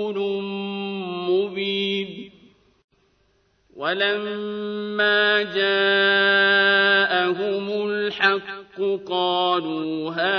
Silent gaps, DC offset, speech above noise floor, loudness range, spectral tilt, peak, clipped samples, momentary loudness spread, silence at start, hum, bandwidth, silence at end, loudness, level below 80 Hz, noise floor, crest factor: 2.84-2.88 s; under 0.1%; 43 dB; 9 LU; -6 dB/octave; -4 dBFS; under 0.1%; 13 LU; 0 s; none; 6.2 kHz; 0 s; -21 LUFS; -70 dBFS; -64 dBFS; 18 dB